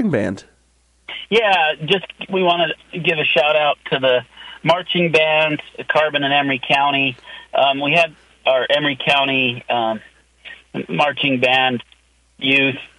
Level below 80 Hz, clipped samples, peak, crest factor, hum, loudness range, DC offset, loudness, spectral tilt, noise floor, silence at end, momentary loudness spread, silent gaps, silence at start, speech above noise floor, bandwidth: -58 dBFS; under 0.1%; -2 dBFS; 16 dB; none; 2 LU; under 0.1%; -17 LUFS; -5 dB/octave; -58 dBFS; 0.1 s; 10 LU; none; 0 s; 41 dB; 11.5 kHz